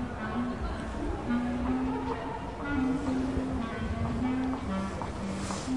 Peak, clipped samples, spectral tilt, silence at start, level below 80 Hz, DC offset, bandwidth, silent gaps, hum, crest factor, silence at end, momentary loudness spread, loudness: -18 dBFS; under 0.1%; -6.5 dB/octave; 0 s; -42 dBFS; 0.2%; 11.5 kHz; none; none; 12 dB; 0 s; 5 LU; -32 LUFS